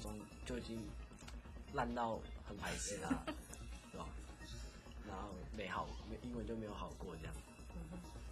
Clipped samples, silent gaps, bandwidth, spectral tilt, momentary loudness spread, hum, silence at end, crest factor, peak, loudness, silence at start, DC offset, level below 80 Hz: under 0.1%; none; 15 kHz; -4.5 dB/octave; 12 LU; none; 0 s; 20 dB; -26 dBFS; -48 LUFS; 0 s; under 0.1%; -54 dBFS